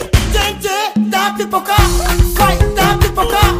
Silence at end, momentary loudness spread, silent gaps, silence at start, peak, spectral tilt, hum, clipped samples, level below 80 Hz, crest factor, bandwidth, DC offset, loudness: 0 s; 4 LU; none; 0 s; 0 dBFS; -4.5 dB/octave; none; under 0.1%; -18 dBFS; 12 dB; 16 kHz; under 0.1%; -13 LUFS